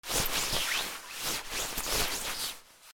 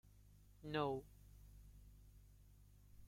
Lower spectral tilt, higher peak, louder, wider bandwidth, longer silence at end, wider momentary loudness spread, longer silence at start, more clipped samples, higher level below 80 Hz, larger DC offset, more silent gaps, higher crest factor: second, -0.5 dB/octave vs -6.5 dB/octave; first, -14 dBFS vs -28 dBFS; first, -31 LUFS vs -45 LUFS; first, over 20 kHz vs 16.5 kHz; about the same, 0 s vs 0 s; second, 7 LU vs 26 LU; about the same, 0.05 s vs 0.05 s; neither; first, -48 dBFS vs -66 dBFS; neither; neither; about the same, 20 dB vs 24 dB